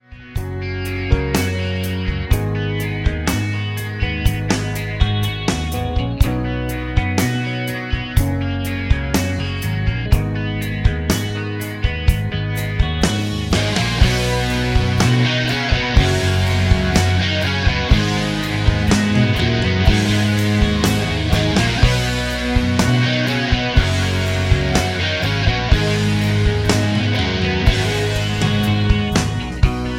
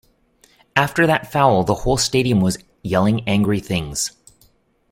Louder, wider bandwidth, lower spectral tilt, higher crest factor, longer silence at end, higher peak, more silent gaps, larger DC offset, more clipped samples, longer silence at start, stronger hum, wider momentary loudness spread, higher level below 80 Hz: about the same, -18 LUFS vs -19 LUFS; about the same, 16.5 kHz vs 16.5 kHz; about the same, -5.5 dB/octave vs -5 dB/octave; about the same, 16 dB vs 18 dB; second, 0 s vs 0.8 s; about the same, 0 dBFS vs -2 dBFS; neither; neither; neither; second, 0.1 s vs 0.75 s; neither; about the same, 6 LU vs 7 LU; first, -24 dBFS vs -40 dBFS